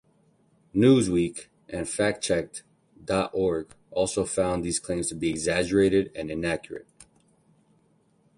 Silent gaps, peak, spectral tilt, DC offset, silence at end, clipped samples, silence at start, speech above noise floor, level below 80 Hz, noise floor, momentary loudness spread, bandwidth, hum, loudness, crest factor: none; -8 dBFS; -5 dB/octave; under 0.1%; 1.55 s; under 0.1%; 0.75 s; 40 dB; -52 dBFS; -65 dBFS; 15 LU; 11.5 kHz; none; -26 LUFS; 20 dB